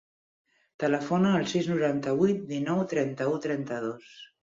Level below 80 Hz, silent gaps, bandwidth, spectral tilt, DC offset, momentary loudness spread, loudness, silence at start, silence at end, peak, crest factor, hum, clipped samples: -68 dBFS; none; 7.8 kHz; -6.5 dB/octave; under 0.1%; 9 LU; -28 LUFS; 0.8 s; 0.15 s; -12 dBFS; 18 dB; none; under 0.1%